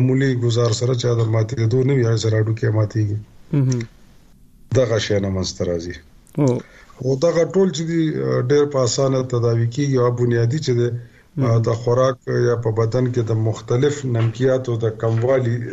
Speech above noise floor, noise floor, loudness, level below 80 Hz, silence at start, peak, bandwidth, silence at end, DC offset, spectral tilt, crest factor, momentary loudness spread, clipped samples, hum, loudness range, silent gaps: 29 dB; -47 dBFS; -19 LUFS; -50 dBFS; 0 s; -4 dBFS; 8 kHz; 0 s; under 0.1%; -6.5 dB/octave; 14 dB; 6 LU; under 0.1%; none; 3 LU; none